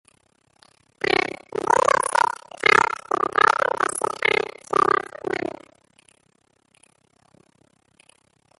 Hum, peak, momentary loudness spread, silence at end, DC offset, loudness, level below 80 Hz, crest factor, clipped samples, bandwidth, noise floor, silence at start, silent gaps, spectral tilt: none; -2 dBFS; 11 LU; 3.1 s; under 0.1%; -21 LUFS; -60 dBFS; 22 dB; under 0.1%; 12 kHz; -65 dBFS; 1.05 s; none; -2.5 dB/octave